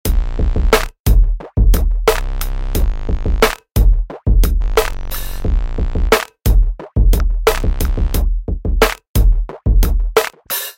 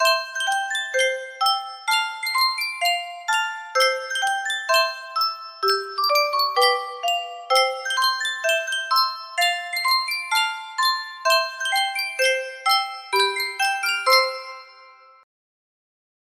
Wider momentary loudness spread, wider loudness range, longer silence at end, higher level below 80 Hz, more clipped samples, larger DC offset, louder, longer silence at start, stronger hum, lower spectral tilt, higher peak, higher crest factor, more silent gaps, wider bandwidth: about the same, 6 LU vs 5 LU; about the same, 1 LU vs 2 LU; second, 0.05 s vs 1.3 s; first, -14 dBFS vs -76 dBFS; neither; neither; first, -17 LUFS vs -21 LUFS; about the same, 0.05 s vs 0 s; neither; first, -5 dB/octave vs 2 dB/octave; first, 0 dBFS vs -4 dBFS; second, 14 dB vs 20 dB; first, 1.00-1.04 s, 9.09-9.14 s vs none; about the same, 17 kHz vs 16 kHz